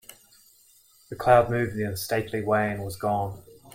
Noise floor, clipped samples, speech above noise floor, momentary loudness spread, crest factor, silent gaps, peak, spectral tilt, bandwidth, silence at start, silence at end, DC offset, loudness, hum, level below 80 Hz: -58 dBFS; under 0.1%; 34 dB; 13 LU; 22 dB; none; -4 dBFS; -6 dB/octave; 16.5 kHz; 0.1 s; 0.05 s; under 0.1%; -25 LUFS; none; -54 dBFS